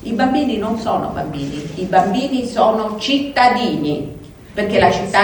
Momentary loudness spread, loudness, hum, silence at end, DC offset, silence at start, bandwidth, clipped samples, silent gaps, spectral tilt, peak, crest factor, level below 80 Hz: 11 LU; -17 LUFS; none; 0 s; under 0.1%; 0 s; 19.5 kHz; under 0.1%; none; -5.5 dB/octave; 0 dBFS; 16 dB; -42 dBFS